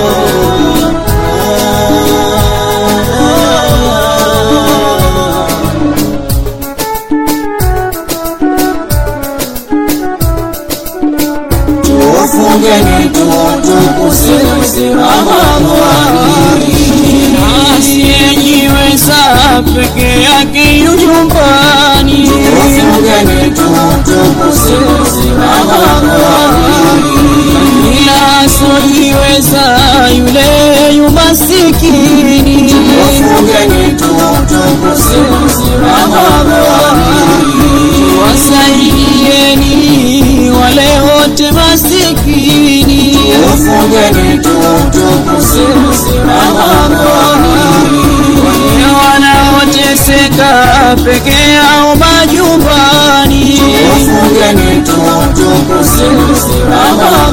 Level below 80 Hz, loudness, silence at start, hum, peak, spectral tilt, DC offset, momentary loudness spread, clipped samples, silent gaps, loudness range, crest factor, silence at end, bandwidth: -18 dBFS; -6 LUFS; 0 s; none; 0 dBFS; -4 dB/octave; under 0.1%; 6 LU; 4%; none; 5 LU; 6 dB; 0 s; over 20 kHz